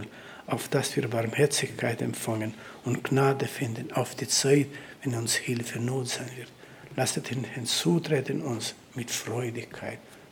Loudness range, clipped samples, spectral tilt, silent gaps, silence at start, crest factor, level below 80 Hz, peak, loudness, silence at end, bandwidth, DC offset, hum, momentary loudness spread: 3 LU; under 0.1%; -4 dB/octave; none; 0 s; 20 dB; -70 dBFS; -10 dBFS; -29 LUFS; 0 s; 19.5 kHz; under 0.1%; none; 14 LU